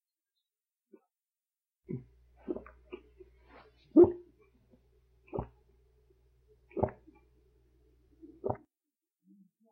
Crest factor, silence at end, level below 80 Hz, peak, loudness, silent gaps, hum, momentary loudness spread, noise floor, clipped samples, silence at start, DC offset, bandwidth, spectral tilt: 26 dB; 1.15 s; -60 dBFS; -10 dBFS; -32 LUFS; none; none; 28 LU; under -90 dBFS; under 0.1%; 1.9 s; under 0.1%; 3 kHz; -11.5 dB/octave